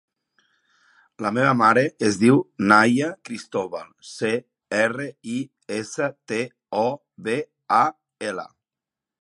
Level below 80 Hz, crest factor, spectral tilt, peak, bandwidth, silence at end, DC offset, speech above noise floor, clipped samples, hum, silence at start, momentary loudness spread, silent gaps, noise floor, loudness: -68 dBFS; 22 dB; -5.5 dB/octave; 0 dBFS; 11.5 kHz; 0.75 s; under 0.1%; 67 dB; under 0.1%; none; 1.2 s; 15 LU; none; -88 dBFS; -22 LUFS